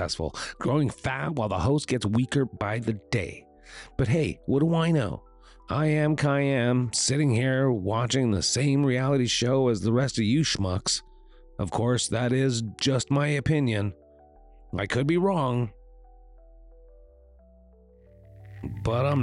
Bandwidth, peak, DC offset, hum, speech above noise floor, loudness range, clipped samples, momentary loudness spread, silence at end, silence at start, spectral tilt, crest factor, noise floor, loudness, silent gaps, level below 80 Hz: 11.5 kHz; -14 dBFS; under 0.1%; none; 30 dB; 6 LU; under 0.1%; 9 LU; 0 s; 0 s; -5 dB/octave; 12 dB; -55 dBFS; -26 LUFS; none; -48 dBFS